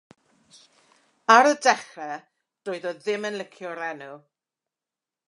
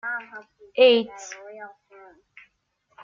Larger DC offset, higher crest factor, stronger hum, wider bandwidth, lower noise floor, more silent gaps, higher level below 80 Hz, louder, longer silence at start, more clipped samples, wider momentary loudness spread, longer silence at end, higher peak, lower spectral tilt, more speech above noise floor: neither; first, 26 dB vs 20 dB; neither; first, 11 kHz vs 7.6 kHz; first, -90 dBFS vs -70 dBFS; neither; second, -84 dBFS vs -76 dBFS; about the same, -23 LUFS vs -21 LUFS; first, 1.3 s vs 0.05 s; neither; second, 22 LU vs 26 LU; second, 1.1 s vs 1.35 s; first, -2 dBFS vs -6 dBFS; about the same, -2.5 dB/octave vs -2.5 dB/octave; first, 66 dB vs 49 dB